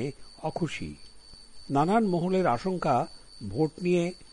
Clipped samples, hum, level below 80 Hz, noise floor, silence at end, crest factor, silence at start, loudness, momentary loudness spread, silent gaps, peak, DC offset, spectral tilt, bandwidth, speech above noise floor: under 0.1%; none; -52 dBFS; -47 dBFS; 0.05 s; 16 dB; 0 s; -28 LUFS; 14 LU; none; -12 dBFS; under 0.1%; -7 dB/octave; 11.5 kHz; 19 dB